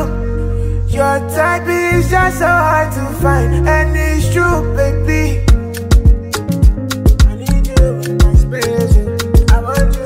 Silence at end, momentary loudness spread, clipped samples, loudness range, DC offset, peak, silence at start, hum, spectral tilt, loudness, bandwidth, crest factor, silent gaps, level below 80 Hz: 0 s; 5 LU; under 0.1%; 1 LU; under 0.1%; 0 dBFS; 0 s; none; -6 dB/octave; -13 LUFS; 16 kHz; 12 dB; none; -14 dBFS